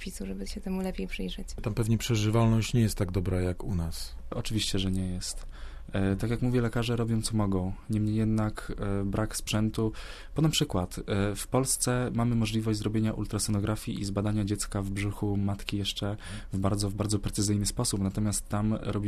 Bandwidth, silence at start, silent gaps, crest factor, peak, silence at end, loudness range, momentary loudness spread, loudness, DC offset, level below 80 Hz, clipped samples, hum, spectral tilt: 14 kHz; 0 s; none; 18 dB; -10 dBFS; 0 s; 3 LU; 10 LU; -30 LUFS; under 0.1%; -40 dBFS; under 0.1%; none; -5.5 dB/octave